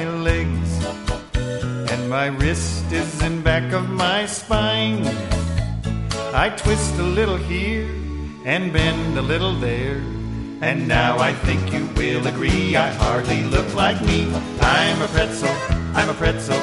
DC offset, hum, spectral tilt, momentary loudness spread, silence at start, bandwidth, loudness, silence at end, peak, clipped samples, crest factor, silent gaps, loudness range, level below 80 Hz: 0.1%; none; -5 dB/octave; 7 LU; 0 s; 11.5 kHz; -21 LUFS; 0 s; -2 dBFS; under 0.1%; 18 dB; none; 3 LU; -28 dBFS